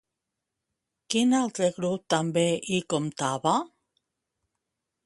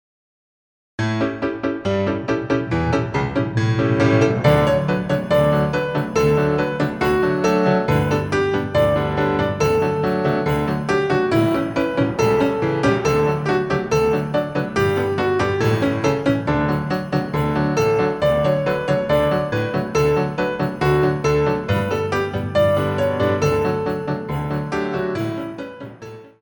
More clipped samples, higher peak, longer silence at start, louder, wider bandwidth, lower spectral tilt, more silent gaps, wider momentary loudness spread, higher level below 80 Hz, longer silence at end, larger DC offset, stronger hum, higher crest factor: neither; second, -8 dBFS vs -2 dBFS; about the same, 1.1 s vs 1 s; second, -26 LUFS vs -19 LUFS; second, 11.5 kHz vs over 20 kHz; second, -4.5 dB/octave vs -7 dB/octave; neither; about the same, 6 LU vs 6 LU; second, -70 dBFS vs -40 dBFS; first, 1.4 s vs 0.15 s; neither; neither; first, 22 dB vs 16 dB